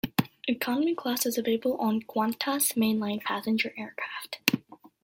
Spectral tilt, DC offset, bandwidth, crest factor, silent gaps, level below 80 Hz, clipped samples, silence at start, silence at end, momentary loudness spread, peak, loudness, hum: -3.5 dB/octave; under 0.1%; 17 kHz; 28 dB; none; -68 dBFS; under 0.1%; 0.05 s; 0.15 s; 8 LU; 0 dBFS; -28 LUFS; none